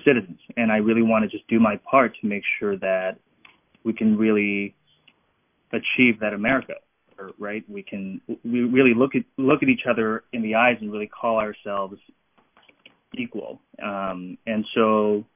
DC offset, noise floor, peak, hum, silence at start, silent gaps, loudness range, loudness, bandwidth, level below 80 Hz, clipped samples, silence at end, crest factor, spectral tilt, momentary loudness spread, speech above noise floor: under 0.1%; -68 dBFS; -2 dBFS; none; 0.05 s; none; 7 LU; -22 LUFS; 3.7 kHz; -60 dBFS; under 0.1%; 0.1 s; 22 dB; -10 dB/octave; 15 LU; 46 dB